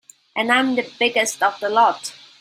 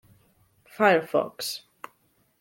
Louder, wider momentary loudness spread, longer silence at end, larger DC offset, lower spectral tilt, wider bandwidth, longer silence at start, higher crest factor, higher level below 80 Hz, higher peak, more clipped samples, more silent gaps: first, -19 LUFS vs -24 LUFS; second, 13 LU vs 25 LU; second, 0.3 s vs 0.85 s; neither; second, -1.5 dB/octave vs -4 dB/octave; about the same, 16 kHz vs 17 kHz; second, 0.35 s vs 0.8 s; about the same, 18 dB vs 22 dB; about the same, -70 dBFS vs -74 dBFS; first, -2 dBFS vs -8 dBFS; neither; neither